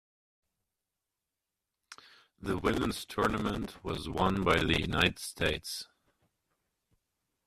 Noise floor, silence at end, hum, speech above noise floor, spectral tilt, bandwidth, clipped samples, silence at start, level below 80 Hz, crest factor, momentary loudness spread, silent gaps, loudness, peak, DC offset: -88 dBFS; 1.65 s; none; 57 dB; -4.5 dB/octave; 14 kHz; under 0.1%; 1.9 s; -50 dBFS; 24 dB; 12 LU; none; -31 LUFS; -10 dBFS; under 0.1%